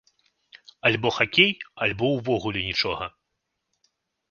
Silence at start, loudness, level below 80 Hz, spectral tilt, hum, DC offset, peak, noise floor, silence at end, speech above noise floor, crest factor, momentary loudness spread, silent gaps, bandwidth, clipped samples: 0.55 s; -23 LUFS; -54 dBFS; -5 dB/octave; none; under 0.1%; -2 dBFS; -79 dBFS; 1.2 s; 55 dB; 26 dB; 9 LU; none; 7.2 kHz; under 0.1%